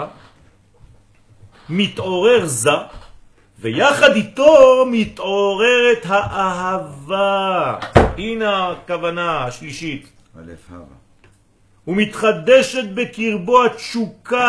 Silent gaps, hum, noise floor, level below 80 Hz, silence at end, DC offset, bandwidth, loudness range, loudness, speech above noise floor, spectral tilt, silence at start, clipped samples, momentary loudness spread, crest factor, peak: none; none; -54 dBFS; -40 dBFS; 0 s; under 0.1%; 11 kHz; 10 LU; -16 LUFS; 38 dB; -4.5 dB/octave; 0 s; under 0.1%; 13 LU; 18 dB; 0 dBFS